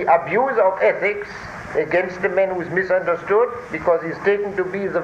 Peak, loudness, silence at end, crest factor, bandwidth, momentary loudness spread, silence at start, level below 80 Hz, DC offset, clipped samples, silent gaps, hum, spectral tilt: -4 dBFS; -20 LUFS; 0 s; 16 dB; 8.4 kHz; 7 LU; 0 s; -52 dBFS; under 0.1%; under 0.1%; none; none; -6.5 dB/octave